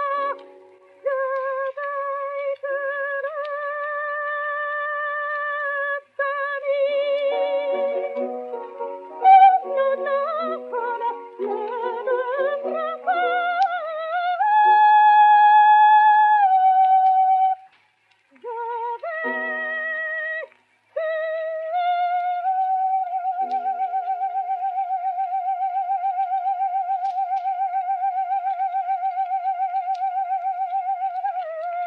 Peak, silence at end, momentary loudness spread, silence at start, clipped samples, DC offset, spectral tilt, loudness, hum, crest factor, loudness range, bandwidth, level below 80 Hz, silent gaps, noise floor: -4 dBFS; 0 s; 14 LU; 0 s; under 0.1%; under 0.1%; -3 dB/octave; -21 LUFS; none; 18 dB; 11 LU; 5 kHz; under -90 dBFS; none; -62 dBFS